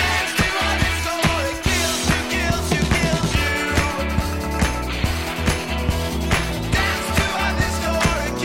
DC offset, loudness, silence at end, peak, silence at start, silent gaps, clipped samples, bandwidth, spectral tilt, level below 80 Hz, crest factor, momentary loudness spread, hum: 0.5%; -20 LUFS; 0 s; -6 dBFS; 0 s; none; under 0.1%; 16.5 kHz; -4 dB/octave; -28 dBFS; 14 dB; 4 LU; none